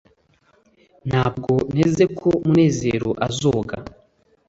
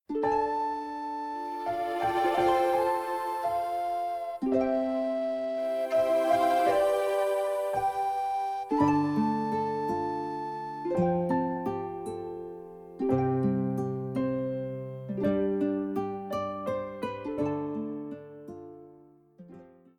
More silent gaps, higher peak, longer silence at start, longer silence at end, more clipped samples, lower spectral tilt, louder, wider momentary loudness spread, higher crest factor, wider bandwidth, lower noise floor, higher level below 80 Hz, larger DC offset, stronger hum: neither; first, -4 dBFS vs -12 dBFS; first, 1.05 s vs 0.1 s; first, 0.6 s vs 0.3 s; neither; about the same, -6.5 dB/octave vs -7 dB/octave; first, -20 LUFS vs -29 LUFS; second, 8 LU vs 12 LU; about the same, 18 dB vs 18 dB; second, 8 kHz vs 19 kHz; first, -60 dBFS vs -56 dBFS; first, -48 dBFS vs -62 dBFS; neither; neither